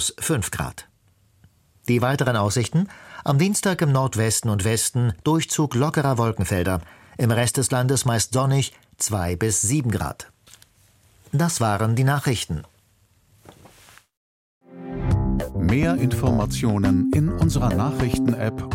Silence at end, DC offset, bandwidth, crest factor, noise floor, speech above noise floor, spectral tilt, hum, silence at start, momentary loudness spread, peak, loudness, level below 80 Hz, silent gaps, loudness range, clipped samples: 0 s; under 0.1%; 16.5 kHz; 16 dB; -60 dBFS; 39 dB; -5 dB/octave; none; 0 s; 9 LU; -6 dBFS; -22 LUFS; -38 dBFS; 14.17-14.61 s; 5 LU; under 0.1%